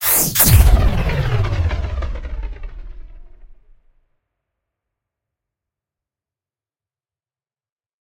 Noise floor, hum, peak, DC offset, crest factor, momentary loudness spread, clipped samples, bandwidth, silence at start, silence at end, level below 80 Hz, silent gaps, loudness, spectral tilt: under -90 dBFS; none; 0 dBFS; under 0.1%; 20 dB; 21 LU; under 0.1%; 16.5 kHz; 0 s; 4.5 s; -24 dBFS; none; -16 LUFS; -4 dB/octave